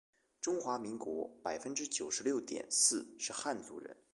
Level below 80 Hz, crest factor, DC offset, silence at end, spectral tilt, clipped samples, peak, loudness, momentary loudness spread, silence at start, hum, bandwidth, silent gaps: -78 dBFS; 24 dB; under 0.1%; 0.2 s; -1.5 dB/octave; under 0.1%; -14 dBFS; -36 LUFS; 12 LU; 0.4 s; none; 12 kHz; none